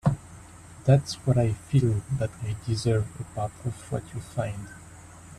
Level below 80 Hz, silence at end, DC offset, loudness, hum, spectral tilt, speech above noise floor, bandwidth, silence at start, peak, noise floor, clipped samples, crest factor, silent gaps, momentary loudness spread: -50 dBFS; 0.05 s; under 0.1%; -28 LUFS; none; -7 dB/octave; 20 dB; 12.5 kHz; 0.05 s; -8 dBFS; -47 dBFS; under 0.1%; 20 dB; none; 23 LU